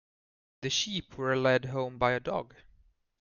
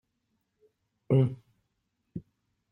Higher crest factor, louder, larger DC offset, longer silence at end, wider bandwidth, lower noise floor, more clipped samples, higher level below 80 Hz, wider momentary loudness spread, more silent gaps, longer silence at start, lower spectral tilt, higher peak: about the same, 20 dB vs 20 dB; second, -30 LUFS vs -27 LUFS; neither; first, 0.75 s vs 0.5 s; first, 7.4 kHz vs 3.3 kHz; second, -65 dBFS vs -79 dBFS; neither; first, -60 dBFS vs -66 dBFS; second, 10 LU vs 20 LU; neither; second, 0.6 s vs 1.1 s; second, -4 dB/octave vs -11 dB/octave; about the same, -12 dBFS vs -14 dBFS